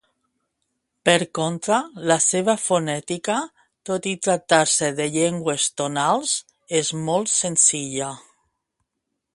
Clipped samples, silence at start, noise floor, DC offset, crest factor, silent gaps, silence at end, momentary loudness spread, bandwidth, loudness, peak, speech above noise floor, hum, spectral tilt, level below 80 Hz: under 0.1%; 1.05 s; -79 dBFS; under 0.1%; 22 dB; none; 1.15 s; 10 LU; 11.5 kHz; -21 LUFS; 0 dBFS; 58 dB; none; -2.5 dB/octave; -66 dBFS